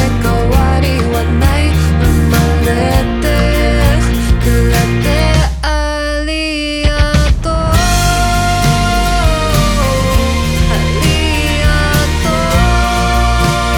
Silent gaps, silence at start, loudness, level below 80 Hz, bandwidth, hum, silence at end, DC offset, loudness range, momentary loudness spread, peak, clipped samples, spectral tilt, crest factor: none; 0 s; -12 LUFS; -16 dBFS; 19.5 kHz; none; 0 s; under 0.1%; 1 LU; 3 LU; 0 dBFS; under 0.1%; -5 dB/octave; 10 dB